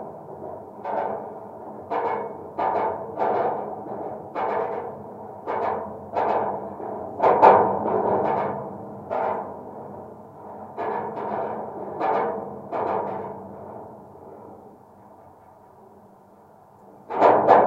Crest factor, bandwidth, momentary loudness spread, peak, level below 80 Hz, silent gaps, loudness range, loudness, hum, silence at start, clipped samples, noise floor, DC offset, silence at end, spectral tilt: 24 dB; 7.6 kHz; 20 LU; 0 dBFS; -68 dBFS; none; 12 LU; -24 LUFS; none; 0 s; under 0.1%; -51 dBFS; under 0.1%; 0 s; -8 dB/octave